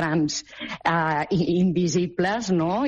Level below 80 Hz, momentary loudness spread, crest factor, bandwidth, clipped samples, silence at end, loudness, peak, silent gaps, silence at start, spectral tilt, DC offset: -54 dBFS; 6 LU; 12 dB; 7.8 kHz; under 0.1%; 0 s; -23 LUFS; -10 dBFS; none; 0 s; -5.5 dB/octave; under 0.1%